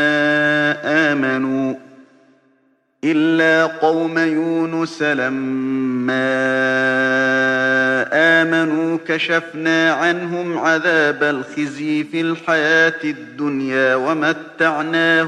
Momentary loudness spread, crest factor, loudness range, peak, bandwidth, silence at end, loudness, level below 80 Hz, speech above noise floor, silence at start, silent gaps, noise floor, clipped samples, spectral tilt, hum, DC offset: 7 LU; 16 dB; 3 LU; -2 dBFS; 9.6 kHz; 0 s; -17 LUFS; -68 dBFS; 43 dB; 0 s; none; -60 dBFS; under 0.1%; -5 dB/octave; none; under 0.1%